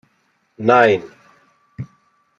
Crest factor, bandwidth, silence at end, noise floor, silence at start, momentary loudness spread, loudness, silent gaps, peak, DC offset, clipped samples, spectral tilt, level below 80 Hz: 20 dB; 7.6 kHz; 0.55 s; -64 dBFS; 0.6 s; 22 LU; -15 LUFS; none; -2 dBFS; under 0.1%; under 0.1%; -6.5 dB/octave; -62 dBFS